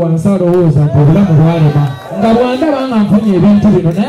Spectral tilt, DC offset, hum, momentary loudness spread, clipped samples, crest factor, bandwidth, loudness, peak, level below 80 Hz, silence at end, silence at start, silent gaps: -9 dB/octave; under 0.1%; none; 5 LU; under 0.1%; 6 dB; 11 kHz; -9 LUFS; -2 dBFS; -38 dBFS; 0 s; 0 s; none